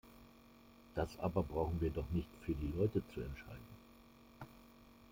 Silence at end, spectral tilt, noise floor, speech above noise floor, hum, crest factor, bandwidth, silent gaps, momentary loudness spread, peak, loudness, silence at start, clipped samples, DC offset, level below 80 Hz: 0 s; -8.5 dB/octave; -62 dBFS; 23 dB; none; 20 dB; 16.5 kHz; none; 24 LU; -22 dBFS; -41 LUFS; 0.05 s; under 0.1%; under 0.1%; -54 dBFS